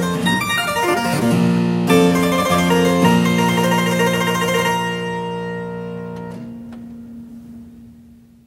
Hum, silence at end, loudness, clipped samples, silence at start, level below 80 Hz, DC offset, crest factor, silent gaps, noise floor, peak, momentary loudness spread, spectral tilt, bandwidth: none; 0.45 s; -17 LUFS; under 0.1%; 0 s; -50 dBFS; under 0.1%; 16 dB; none; -45 dBFS; -2 dBFS; 20 LU; -5 dB/octave; 16 kHz